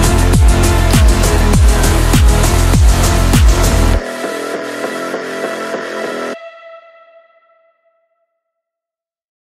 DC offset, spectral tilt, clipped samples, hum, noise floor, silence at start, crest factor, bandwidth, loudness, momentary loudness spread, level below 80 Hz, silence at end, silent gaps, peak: under 0.1%; -5 dB/octave; under 0.1%; none; -88 dBFS; 0 s; 12 dB; 16 kHz; -13 LUFS; 10 LU; -14 dBFS; 2.75 s; none; 0 dBFS